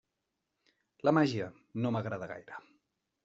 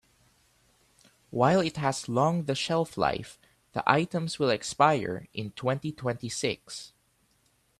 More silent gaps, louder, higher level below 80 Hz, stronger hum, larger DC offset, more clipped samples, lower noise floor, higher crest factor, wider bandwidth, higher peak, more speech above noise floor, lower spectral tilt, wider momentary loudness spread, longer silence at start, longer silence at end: neither; second, -33 LUFS vs -28 LUFS; second, -74 dBFS vs -62 dBFS; neither; neither; neither; first, -85 dBFS vs -69 dBFS; about the same, 24 dB vs 26 dB; second, 7.8 kHz vs 13.5 kHz; second, -12 dBFS vs -4 dBFS; first, 53 dB vs 41 dB; about the same, -6 dB/octave vs -5 dB/octave; first, 19 LU vs 14 LU; second, 1.05 s vs 1.3 s; second, 0.65 s vs 0.95 s